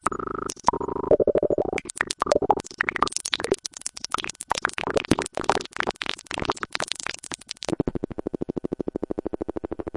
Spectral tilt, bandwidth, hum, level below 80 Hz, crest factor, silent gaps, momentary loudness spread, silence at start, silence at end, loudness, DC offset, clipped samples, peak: -3.5 dB/octave; 11.5 kHz; none; -48 dBFS; 24 dB; none; 9 LU; 0.05 s; 0 s; -27 LUFS; under 0.1%; under 0.1%; -2 dBFS